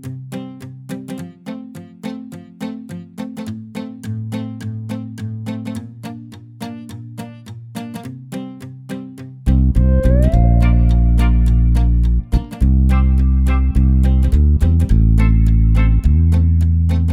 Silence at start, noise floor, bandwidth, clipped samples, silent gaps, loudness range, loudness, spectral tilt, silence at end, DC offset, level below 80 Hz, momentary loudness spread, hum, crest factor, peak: 0.05 s; -34 dBFS; 11 kHz; under 0.1%; none; 16 LU; -16 LUFS; -8.5 dB/octave; 0 s; under 0.1%; -16 dBFS; 18 LU; none; 14 dB; -2 dBFS